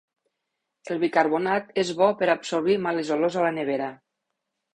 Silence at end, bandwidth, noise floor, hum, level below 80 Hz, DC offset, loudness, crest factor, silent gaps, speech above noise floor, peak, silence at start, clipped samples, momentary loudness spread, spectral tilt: 0.8 s; 10 kHz; -81 dBFS; none; -68 dBFS; under 0.1%; -24 LUFS; 20 dB; none; 58 dB; -4 dBFS; 0.85 s; under 0.1%; 6 LU; -5 dB/octave